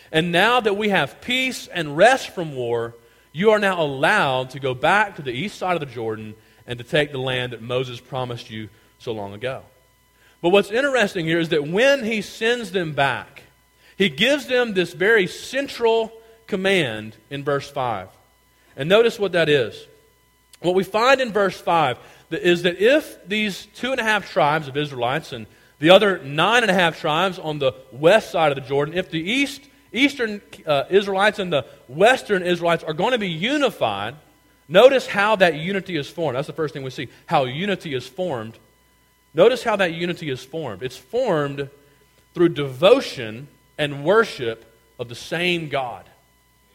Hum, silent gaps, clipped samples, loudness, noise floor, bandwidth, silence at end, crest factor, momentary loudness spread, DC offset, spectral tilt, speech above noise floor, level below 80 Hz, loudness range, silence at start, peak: none; none; under 0.1%; -20 LUFS; -59 dBFS; 16.5 kHz; 0.75 s; 22 dB; 14 LU; under 0.1%; -5 dB/octave; 38 dB; -58 dBFS; 5 LU; 0.1 s; 0 dBFS